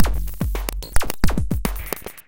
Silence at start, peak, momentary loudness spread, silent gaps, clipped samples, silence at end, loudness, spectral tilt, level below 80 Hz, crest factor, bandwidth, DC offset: 0 s; 0 dBFS; 5 LU; none; under 0.1%; 0.1 s; -26 LUFS; -5 dB/octave; -24 dBFS; 18 dB; 17.5 kHz; under 0.1%